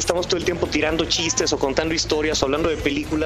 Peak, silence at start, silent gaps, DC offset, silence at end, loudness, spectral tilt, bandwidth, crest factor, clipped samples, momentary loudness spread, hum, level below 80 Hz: -2 dBFS; 0 s; none; under 0.1%; 0 s; -21 LUFS; -3 dB/octave; 14 kHz; 20 dB; under 0.1%; 3 LU; none; -38 dBFS